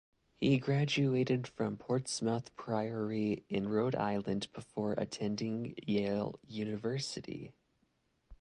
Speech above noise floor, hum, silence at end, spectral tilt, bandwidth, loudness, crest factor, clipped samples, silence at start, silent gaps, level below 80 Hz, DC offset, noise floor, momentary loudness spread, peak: 42 dB; none; 0.05 s; -6 dB/octave; 11 kHz; -35 LUFS; 16 dB; under 0.1%; 0.4 s; none; -66 dBFS; under 0.1%; -77 dBFS; 9 LU; -18 dBFS